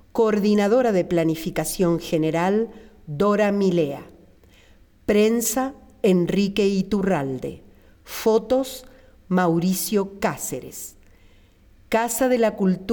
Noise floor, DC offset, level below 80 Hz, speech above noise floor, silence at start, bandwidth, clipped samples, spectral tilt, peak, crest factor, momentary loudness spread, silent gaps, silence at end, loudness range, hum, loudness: -53 dBFS; under 0.1%; -50 dBFS; 32 dB; 0.15 s; 19.5 kHz; under 0.1%; -5.5 dB/octave; -10 dBFS; 14 dB; 13 LU; none; 0 s; 3 LU; none; -22 LUFS